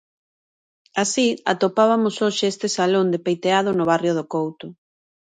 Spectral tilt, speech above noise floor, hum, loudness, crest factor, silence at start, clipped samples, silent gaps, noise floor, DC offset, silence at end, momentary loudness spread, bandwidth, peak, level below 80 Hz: -4.5 dB/octave; over 70 dB; none; -20 LUFS; 20 dB; 0.95 s; under 0.1%; none; under -90 dBFS; under 0.1%; 0.65 s; 8 LU; 9.6 kHz; -2 dBFS; -68 dBFS